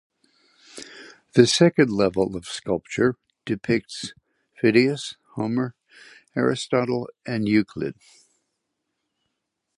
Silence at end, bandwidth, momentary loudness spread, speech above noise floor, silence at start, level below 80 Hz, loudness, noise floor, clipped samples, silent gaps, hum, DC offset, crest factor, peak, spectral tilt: 1.85 s; 11.5 kHz; 19 LU; 57 dB; 0.75 s; -58 dBFS; -23 LUFS; -79 dBFS; under 0.1%; none; none; under 0.1%; 22 dB; -2 dBFS; -5.5 dB/octave